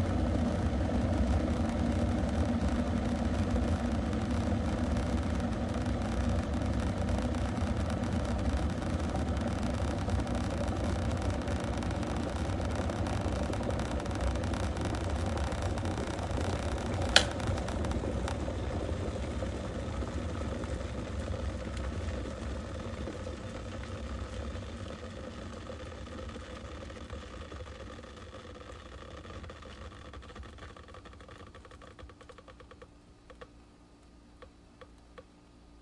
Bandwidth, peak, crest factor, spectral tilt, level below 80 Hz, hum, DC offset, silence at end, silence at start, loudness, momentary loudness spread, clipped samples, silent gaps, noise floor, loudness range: 11.5 kHz; 0 dBFS; 32 dB; -6 dB/octave; -40 dBFS; none; under 0.1%; 0 s; 0 s; -34 LUFS; 17 LU; under 0.1%; none; -57 dBFS; 17 LU